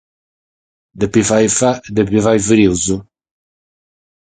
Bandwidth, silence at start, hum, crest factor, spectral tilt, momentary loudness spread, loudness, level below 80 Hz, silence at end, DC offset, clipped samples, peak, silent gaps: 9.6 kHz; 0.95 s; none; 16 dB; -4.5 dB/octave; 7 LU; -14 LUFS; -42 dBFS; 1.2 s; under 0.1%; under 0.1%; 0 dBFS; none